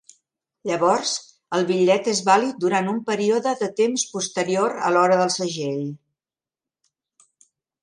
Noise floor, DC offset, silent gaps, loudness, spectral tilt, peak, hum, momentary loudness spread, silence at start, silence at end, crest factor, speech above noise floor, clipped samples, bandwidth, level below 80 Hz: under -90 dBFS; under 0.1%; none; -21 LUFS; -4 dB/octave; -4 dBFS; none; 9 LU; 0.65 s; 1.85 s; 18 dB; over 69 dB; under 0.1%; 11.5 kHz; -72 dBFS